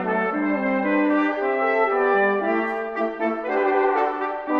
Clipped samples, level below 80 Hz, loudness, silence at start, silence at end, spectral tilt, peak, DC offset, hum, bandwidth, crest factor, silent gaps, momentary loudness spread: under 0.1%; -64 dBFS; -22 LUFS; 0 s; 0 s; -8 dB/octave; -8 dBFS; under 0.1%; none; 6.2 kHz; 14 dB; none; 6 LU